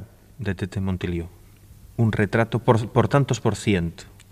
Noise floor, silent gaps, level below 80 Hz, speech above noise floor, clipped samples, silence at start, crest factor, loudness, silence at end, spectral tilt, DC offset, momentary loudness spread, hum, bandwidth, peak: -47 dBFS; none; -46 dBFS; 26 dB; under 0.1%; 0 s; 20 dB; -23 LUFS; 0.25 s; -6.5 dB/octave; under 0.1%; 12 LU; none; 14.5 kHz; -4 dBFS